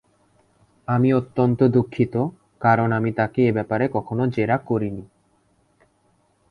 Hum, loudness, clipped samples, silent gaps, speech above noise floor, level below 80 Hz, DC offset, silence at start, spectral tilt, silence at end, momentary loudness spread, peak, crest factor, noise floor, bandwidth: none; -21 LUFS; under 0.1%; none; 43 dB; -54 dBFS; under 0.1%; 0.9 s; -10 dB/octave; 1.45 s; 7 LU; -2 dBFS; 20 dB; -63 dBFS; 5.2 kHz